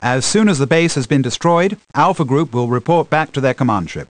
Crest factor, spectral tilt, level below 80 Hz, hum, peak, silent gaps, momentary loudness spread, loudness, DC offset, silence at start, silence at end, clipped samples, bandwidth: 14 dB; -5.5 dB/octave; -48 dBFS; none; 0 dBFS; none; 4 LU; -15 LUFS; under 0.1%; 0 s; 0.05 s; under 0.1%; 10.5 kHz